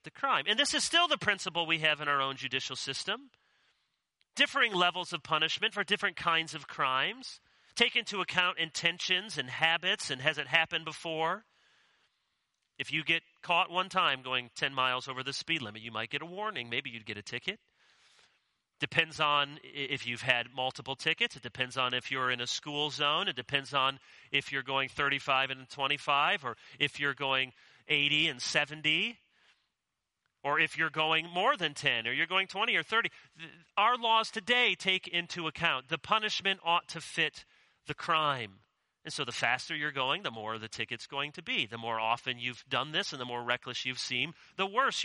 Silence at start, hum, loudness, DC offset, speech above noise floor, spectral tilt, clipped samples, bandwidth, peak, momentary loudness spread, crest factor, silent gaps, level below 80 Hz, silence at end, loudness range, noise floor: 0.05 s; none; -31 LUFS; under 0.1%; 54 dB; -2.5 dB/octave; under 0.1%; 11.5 kHz; -8 dBFS; 10 LU; 26 dB; none; -74 dBFS; 0 s; 4 LU; -86 dBFS